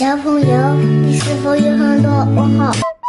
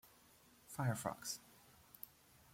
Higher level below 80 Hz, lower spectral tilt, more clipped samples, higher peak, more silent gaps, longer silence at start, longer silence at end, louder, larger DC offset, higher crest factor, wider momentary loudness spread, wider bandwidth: first, -46 dBFS vs -78 dBFS; first, -7 dB/octave vs -4.5 dB/octave; neither; first, -2 dBFS vs -26 dBFS; neither; about the same, 0 s vs 0.05 s; second, 0 s vs 0.45 s; first, -13 LUFS vs -45 LUFS; neither; second, 10 dB vs 22 dB; second, 3 LU vs 25 LU; second, 11.5 kHz vs 16.5 kHz